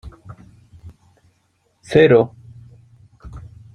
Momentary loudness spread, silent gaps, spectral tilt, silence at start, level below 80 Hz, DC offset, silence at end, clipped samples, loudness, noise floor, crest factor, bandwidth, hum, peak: 28 LU; none; -7.5 dB/octave; 0.05 s; -48 dBFS; under 0.1%; 0.35 s; under 0.1%; -15 LUFS; -64 dBFS; 20 dB; 10 kHz; none; -2 dBFS